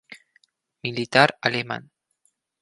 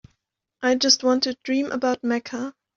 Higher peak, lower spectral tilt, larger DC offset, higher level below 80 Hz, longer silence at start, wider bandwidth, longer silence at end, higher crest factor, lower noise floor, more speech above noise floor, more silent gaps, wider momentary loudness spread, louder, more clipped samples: first, 0 dBFS vs -4 dBFS; first, -4.5 dB/octave vs -1.5 dB/octave; neither; about the same, -66 dBFS vs -66 dBFS; second, 0.1 s vs 0.6 s; first, 11.5 kHz vs 7.4 kHz; first, 0.8 s vs 0.25 s; first, 26 dB vs 20 dB; second, -70 dBFS vs -76 dBFS; second, 48 dB vs 54 dB; neither; first, 15 LU vs 9 LU; about the same, -22 LUFS vs -22 LUFS; neither